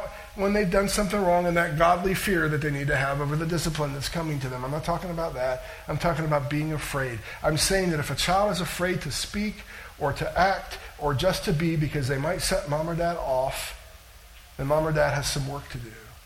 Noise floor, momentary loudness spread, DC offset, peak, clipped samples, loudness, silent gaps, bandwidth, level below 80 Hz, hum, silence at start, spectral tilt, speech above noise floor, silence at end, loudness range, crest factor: -48 dBFS; 10 LU; under 0.1%; -8 dBFS; under 0.1%; -26 LUFS; none; 17 kHz; -42 dBFS; none; 0 s; -4.5 dB/octave; 22 dB; 0 s; 4 LU; 20 dB